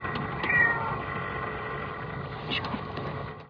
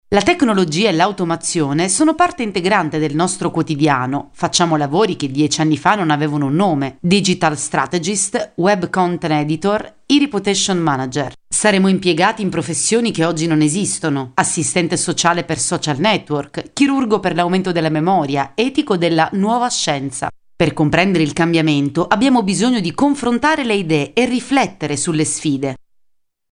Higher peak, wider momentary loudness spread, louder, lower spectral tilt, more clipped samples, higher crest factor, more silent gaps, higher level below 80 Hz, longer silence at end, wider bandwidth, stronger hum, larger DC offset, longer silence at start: second, -12 dBFS vs 0 dBFS; first, 14 LU vs 5 LU; second, -29 LUFS vs -16 LUFS; first, -7 dB/octave vs -4.5 dB/octave; neither; about the same, 18 dB vs 16 dB; neither; about the same, -50 dBFS vs -50 dBFS; second, 0 s vs 0.75 s; second, 5.4 kHz vs 10.5 kHz; neither; neither; about the same, 0 s vs 0.1 s